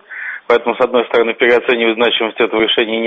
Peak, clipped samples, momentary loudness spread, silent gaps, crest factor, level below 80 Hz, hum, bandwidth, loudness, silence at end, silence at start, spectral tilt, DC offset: 0 dBFS; under 0.1%; 3 LU; none; 14 dB; -54 dBFS; none; 6.2 kHz; -13 LUFS; 0 s; 0.1 s; -5 dB/octave; under 0.1%